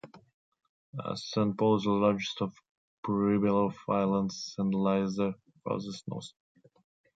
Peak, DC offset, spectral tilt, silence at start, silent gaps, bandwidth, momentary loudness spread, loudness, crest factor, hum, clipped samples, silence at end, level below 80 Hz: -12 dBFS; under 0.1%; -6.5 dB/octave; 0.05 s; 0.34-0.52 s, 0.69-0.93 s, 2.69-3.03 s; 7.8 kHz; 14 LU; -30 LUFS; 18 dB; none; under 0.1%; 0.85 s; -64 dBFS